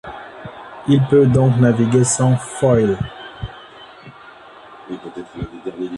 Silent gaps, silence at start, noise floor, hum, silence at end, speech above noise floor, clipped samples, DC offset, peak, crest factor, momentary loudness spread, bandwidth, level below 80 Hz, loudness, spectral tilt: none; 0.05 s; -41 dBFS; none; 0 s; 27 dB; under 0.1%; under 0.1%; -2 dBFS; 16 dB; 21 LU; 11.5 kHz; -44 dBFS; -16 LUFS; -6.5 dB/octave